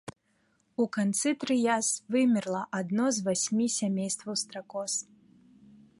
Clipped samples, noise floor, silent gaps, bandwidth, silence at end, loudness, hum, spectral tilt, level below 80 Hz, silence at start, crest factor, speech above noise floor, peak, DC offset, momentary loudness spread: under 0.1%; -71 dBFS; none; 11.5 kHz; 0.95 s; -29 LUFS; none; -4 dB/octave; -74 dBFS; 0.05 s; 18 dB; 42 dB; -14 dBFS; under 0.1%; 8 LU